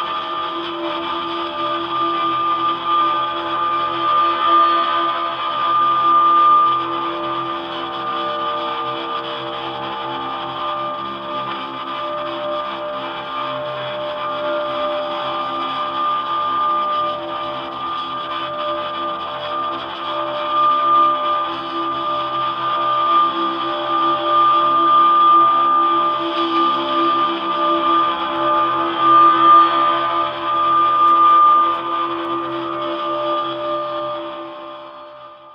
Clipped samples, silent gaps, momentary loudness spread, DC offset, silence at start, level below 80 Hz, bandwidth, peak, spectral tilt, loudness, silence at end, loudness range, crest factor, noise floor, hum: under 0.1%; none; 13 LU; under 0.1%; 0 s; -60 dBFS; 5.8 kHz; -2 dBFS; -5.5 dB/octave; -17 LUFS; 0 s; 10 LU; 16 dB; -38 dBFS; none